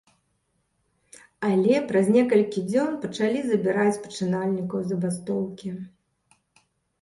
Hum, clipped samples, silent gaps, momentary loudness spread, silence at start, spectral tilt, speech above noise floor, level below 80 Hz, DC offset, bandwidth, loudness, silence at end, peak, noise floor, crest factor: none; under 0.1%; none; 11 LU; 1.4 s; -6.5 dB/octave; 49 dB; -68 dBFS; under 0.1%; 11.5 kHz; -24 LUFS; 1.15 s; -6 dBFS; -72 dBFS; 18 dB